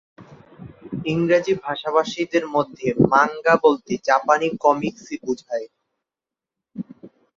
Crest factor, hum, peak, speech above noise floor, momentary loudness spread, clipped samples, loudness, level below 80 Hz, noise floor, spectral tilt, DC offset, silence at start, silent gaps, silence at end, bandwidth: 20 dB; none; -2 dBFS; 68 dB; 18 LU; under 0.1%; -20 LUFS; -58 dBFS; -88 dBFS; -6 dB/octave; under 0.1%; 0.2 s; none; 0.3 s; 7.6 kHz